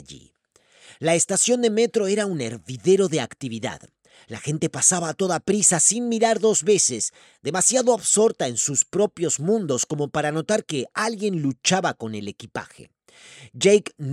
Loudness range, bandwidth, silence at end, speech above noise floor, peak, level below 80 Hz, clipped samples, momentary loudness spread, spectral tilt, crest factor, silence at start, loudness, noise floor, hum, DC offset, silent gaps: 5 LU; 15 kHz; 0 s; 34 dB; -2 dBFS; -66 dBFS; under 0.1%; 13 LU; -3.5 dB/octave; 20 dB; 0.1 s; -21 LUFS; -56 dBFS; none; under 0.1%; none